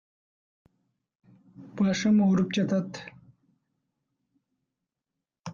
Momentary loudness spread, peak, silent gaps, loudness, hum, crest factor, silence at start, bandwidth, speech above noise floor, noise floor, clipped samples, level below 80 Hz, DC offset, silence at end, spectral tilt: 23 LU; -14 dBFS; 5.39-5.44 s; -25 LUFS; none; 16 dB; 1.6 s; 7.4 kHz; 63 dB; -87 dBFS; under 0.1%; -68 dBFS; under 0.1%; 0 s; -6.5 dB/octave